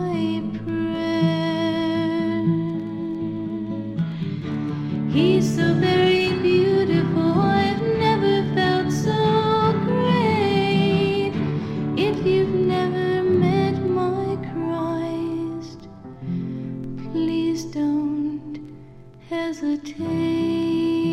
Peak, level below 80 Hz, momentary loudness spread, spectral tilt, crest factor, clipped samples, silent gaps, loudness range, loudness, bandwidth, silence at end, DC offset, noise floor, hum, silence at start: -6 dBFS; -52 dBFS; 10 LU; -7 dB/octave; 14 dB; under 0.1%; none; 7 LU; -22 LUFS; 12.5 kHz; 0 s; under 0.1%; -43 dBFS; none; 0 s